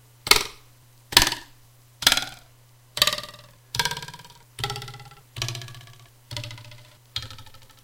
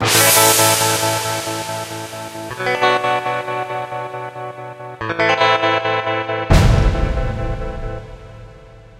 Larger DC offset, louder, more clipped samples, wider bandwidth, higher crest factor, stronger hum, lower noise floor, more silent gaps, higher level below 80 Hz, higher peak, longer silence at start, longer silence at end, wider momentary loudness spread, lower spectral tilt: neither; second, -23 LUFS vs -16 LUFS; neither; about the same, 17 kHz vs 16 kHz; first, 28 dB vs 18 dB; neither; first, -54 dBFS vs -40 dBFS; neither; second, -46 dBFS vs -26 dBFS; about the same, 0 dBFS vs 0 dBFS; first, 0.25 s vs 0 s; about the same, 0.2 s vs 0.2 s; first, 23 LU vs 18 LU; second, -1 dB/octave vs -3 dB/octave